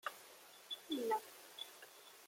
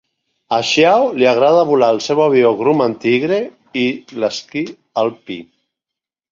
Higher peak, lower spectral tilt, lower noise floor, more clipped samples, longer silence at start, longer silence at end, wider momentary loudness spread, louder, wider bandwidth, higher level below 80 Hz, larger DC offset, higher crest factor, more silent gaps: second, -28 dBFS vs -2 dBFS; second, -1.5 dB/octave vs -5 dB/octave; second, -61 dBFS vs -85 dBFS; neither; second, 0.05 s vs 0.5 s; second, 0 s vs 0.9 s; first, 18 LU vs 12 LU; second, -45 LUFS vs -15 LUFS; first, 16.5 kHz vs 7.6 kHz; second, under -90 dBFS vs -62 dBFS; neither; first, 20 dB vs 14 dB; neither